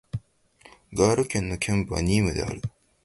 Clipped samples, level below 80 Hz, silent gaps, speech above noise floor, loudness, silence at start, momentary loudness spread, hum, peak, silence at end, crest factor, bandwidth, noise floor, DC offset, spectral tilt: under 0.1%; -42 dBFS; none; 32 dB; -25 LUFS; 0.15 s; 15 LU; none; -6 dBFS; 0.35 s; 22 dB; 11.5 kHz; -56 dBFS; under 0.1%; -5.5 dB/octave